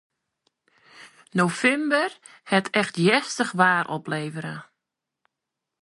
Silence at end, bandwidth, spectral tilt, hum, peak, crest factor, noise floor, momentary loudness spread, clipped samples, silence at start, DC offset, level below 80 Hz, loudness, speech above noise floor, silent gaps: 1.2 s; 11.5 kHz; -4.5 dB/octave; none; -2 dBFS; 22 dB; -85 dBFS; 11 LU; under 0.1%; 0.95 s; under 0.1%; -72 dBFS; -23 LUFS; 61 dB; none